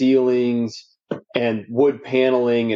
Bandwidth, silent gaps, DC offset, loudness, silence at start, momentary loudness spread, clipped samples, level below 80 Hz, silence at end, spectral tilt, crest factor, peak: 7.4 kHz; none; under 0.1%; -20 LUFS; 0 s; 14 LU; under 0.1%; -72 dBFS; 0 s; -7 dB/octave; 16 dB; -4 dBFS